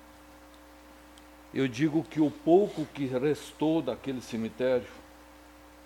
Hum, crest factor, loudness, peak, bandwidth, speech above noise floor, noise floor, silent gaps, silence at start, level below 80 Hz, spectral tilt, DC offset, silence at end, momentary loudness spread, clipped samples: none; 20 dB; -29 LUFS; -10 dBFS; 17 kHz; 24 dB; -53 dBFS; none; 0.3 s; -60 dBFS; -6.5 dB/octave; under 0.1%; 0.85 s; 12 LU; under 0.1%